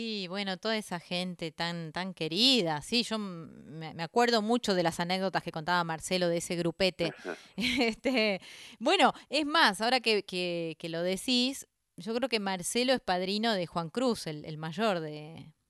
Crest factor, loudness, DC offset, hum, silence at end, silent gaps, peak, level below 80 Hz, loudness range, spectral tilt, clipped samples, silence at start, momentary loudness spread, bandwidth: 22 dB; -30 LUFS; under 0.1%; none; 0.2 s; none; -8 dBFS; -66 dBFS; 3 LU; -4 dB/octave; under 0.1%; 0 s; 14 LU; 13 kHz